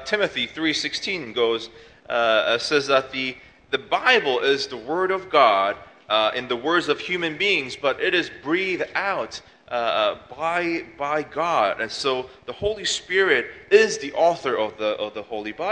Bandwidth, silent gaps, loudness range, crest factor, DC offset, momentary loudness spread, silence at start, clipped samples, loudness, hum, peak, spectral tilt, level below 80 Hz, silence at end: 10 kHz; none; 4 LU; 20 dB; under 0.1%; 11 LU; 0 s; under 0.1%; -22 LUFS; none; -2 dBFS; -3 dB/octave; -58 dBFS; 0 s